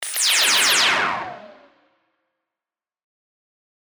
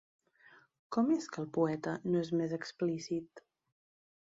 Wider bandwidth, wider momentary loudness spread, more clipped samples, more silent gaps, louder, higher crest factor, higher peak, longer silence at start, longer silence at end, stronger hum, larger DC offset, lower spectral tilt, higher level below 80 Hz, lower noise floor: first, over 20 kHz vs 7.8 kHz; first, 14 LU vs 7 LU; neither; neither; first, -16 LUFS vs -35 LUFS; about the same, 18 dB vs 18 dB; first, -6 dBFS vs -18 dBFS; second, 0 s vs 0.9 s; first, 2.4 s vs 0.9 s; neither; neither; second, 1.5 dB/octave vs -6.5 dB/octave; first, -68 dBFS vs -78 dBFS; first, under -90 dBFS vs -63 dBFS